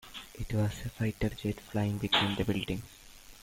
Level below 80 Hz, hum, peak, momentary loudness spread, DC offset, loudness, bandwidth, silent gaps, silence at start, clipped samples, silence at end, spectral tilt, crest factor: -48 dBFS; none; -14 dBFS; 18 LU; under 0.1%; -32 LUFS; 17 kHz; none; 0.05 s; under 0.1%; 0 s; -5.5 dB/octave; 20 dB